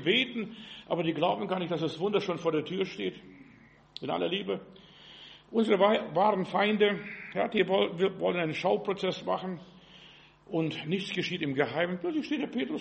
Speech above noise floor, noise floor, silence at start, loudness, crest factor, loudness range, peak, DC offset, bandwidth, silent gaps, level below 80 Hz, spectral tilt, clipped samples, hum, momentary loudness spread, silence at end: 27 dB; -57 dBFS; 0 s; -30 LUFS; 20 dB; 6 LU; -12 dBFS; under 0.1%; 8.4 kHz; none; -70 dBFS; -6 dB/octave; under 0.1%; none; 12 LU; 0 s